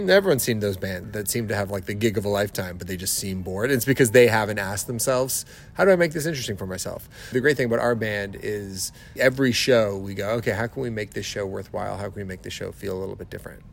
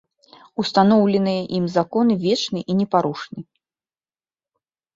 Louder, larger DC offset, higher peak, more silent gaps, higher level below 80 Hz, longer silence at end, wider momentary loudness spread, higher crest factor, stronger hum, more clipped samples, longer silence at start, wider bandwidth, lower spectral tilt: second, -24 LUFS vs -19 LUFS; neither; about the same, -4 dBFS vs -2 dBFS; neither; first, -50 dBFS vs -62 dBFS; second, 0 s vs 1.55 s; second, 13 LU vs 16 LU; about the same, 20 dB vs 20 dB; neither; neither; second, 0 s vs 0.6 s; first, 16.5 kHz vs 7.6 kHz; second, -4.5 dB/octave vs -6.5 dB/octave